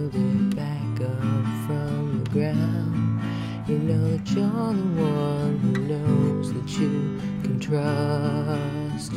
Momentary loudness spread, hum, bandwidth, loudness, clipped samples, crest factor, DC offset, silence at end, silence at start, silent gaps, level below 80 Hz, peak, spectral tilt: 5 LU; none; 13.5 kHz; -25 LUFS; under 0.1%; 12 dB; under 0.1%; 0 s; 0 s; none; -52 dBFS; -10 dBFS; -8 dB/octave